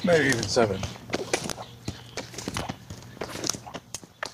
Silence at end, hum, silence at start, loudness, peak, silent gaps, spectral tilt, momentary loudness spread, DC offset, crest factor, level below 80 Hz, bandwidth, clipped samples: 0 s; none; 0 s; -29 LUFS; -4 dBFS; none; -3.5 dB/octave; 16 LU; under 0.1%; 24 dB; -52 dBFS; 15.5 kHz; under 0.1%